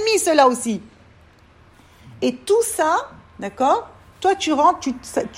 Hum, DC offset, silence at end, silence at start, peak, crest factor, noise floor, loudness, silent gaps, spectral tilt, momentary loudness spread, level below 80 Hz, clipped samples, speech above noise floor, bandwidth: none; under 0.1%; 0 s; 0 s; -2 dBFS; 18 dB; -50 dBFS; -19 LUFS; none; -3 dB/octave; 12 LU; -56 dBFS; under 0.1%; 32 dB; 16 kHz